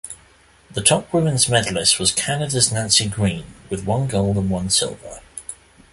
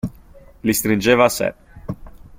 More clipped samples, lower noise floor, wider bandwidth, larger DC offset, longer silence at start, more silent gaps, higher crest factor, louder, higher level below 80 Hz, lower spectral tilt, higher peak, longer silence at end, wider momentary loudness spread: neither; first, -52 dBFS vs -45 dBFS; second, 12 kHz vs 16.5 kHz; neither; about the same, 0.05 s vs 0.05 s; neither; about the same, 20 dB vs 20 dB; about the same, -18 LUFS vs -18 LUFS; about the same, -44 dBFS vs -44 dBFS; second, -3 dB/octave vs -4.5 dB/octave; about the same, 0 dBFS vs -2 dBFS; first, 0.4 s vs 0.1 s; about the same, 18 LU vs 19 LU